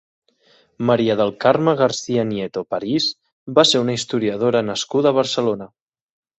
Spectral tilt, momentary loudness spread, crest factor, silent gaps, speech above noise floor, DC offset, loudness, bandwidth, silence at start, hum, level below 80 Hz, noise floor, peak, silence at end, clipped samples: -4.5 dB/octave; 9 LU; 18 dB; 3.32-3.46 s; 39 dB; under 0.1%; -19 LUFS; 8.4 kHz; 0.8 s; none; -60 dBFS; -57 dBFS; -2 dBFS; 0.7 s; under 0.1%